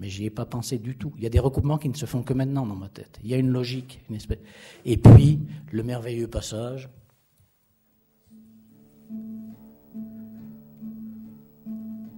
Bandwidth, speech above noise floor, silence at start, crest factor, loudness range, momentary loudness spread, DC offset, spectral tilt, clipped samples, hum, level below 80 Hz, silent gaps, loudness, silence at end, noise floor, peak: 16 kHz; 45 dB; 0 s; 22 dB; 22 LU; 21 LU; under 0.1%; -8 dB/octave; under 0.1%; none; -38 dBFS; none; -22 LUFS; 0 s; -66 dBFS; -2 dBFS